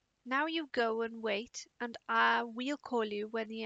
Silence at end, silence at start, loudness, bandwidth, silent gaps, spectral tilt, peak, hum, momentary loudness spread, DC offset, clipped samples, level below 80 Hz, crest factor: 0 s; 0.25 s; -34 LUFS; 8 kHz; none; -3 dB/octave; -16 dBFS; none; 12 LU; under 0.1%; under 0.1%; -80 dBFS; 18 dB